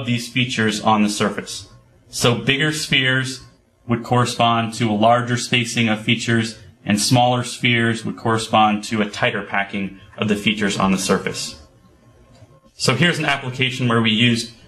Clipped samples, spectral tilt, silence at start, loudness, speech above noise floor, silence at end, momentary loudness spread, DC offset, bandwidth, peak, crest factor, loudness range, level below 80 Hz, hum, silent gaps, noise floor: under 0.1%; -4.5 dB/octave; 0 s; -18 LUFS; 32 dB; 0.15 s; 10 LU; under 0.1%; 13 kHz; 0 dBFS; 20 dB; 3 LU; -52 dBFS; none; none; -51 dBFS